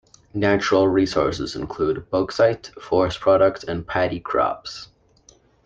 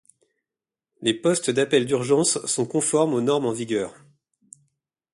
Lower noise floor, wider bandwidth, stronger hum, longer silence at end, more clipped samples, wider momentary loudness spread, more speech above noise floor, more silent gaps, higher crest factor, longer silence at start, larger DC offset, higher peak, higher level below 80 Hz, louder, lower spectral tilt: second, -55 dBFS vs -89 dBFS; second, 7.8 kHz vs 11.5 kHz; neither; second, 0.8 s vs 1.25 s; neither; first, 13 LU vs 7 LU; second, 34 dB vs 67 dB; neither; about the same, 18 dB vs 18 dB; second, 0.35 s vs 1 s; neither; about the same, -4 dBFS vs -6 dBFS; first, -48 dBFS vs -66 dBFS; about the same, -21 LUFS vs -22 LUFS; first, -6 dB/octave vs -4 dB/octave